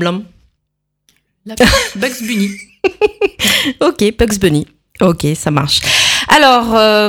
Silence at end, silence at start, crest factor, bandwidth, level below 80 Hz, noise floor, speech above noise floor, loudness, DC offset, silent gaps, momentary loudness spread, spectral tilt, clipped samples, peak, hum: 0 s; 0 s; 14 dB; over 20 kHz; -32 dBFS; -71 dBFS; 59 dB; -12 LUFS; under 0.1%; none; 10 LU; -3.5 dB/octave; 0.1%; 0 dBFS; none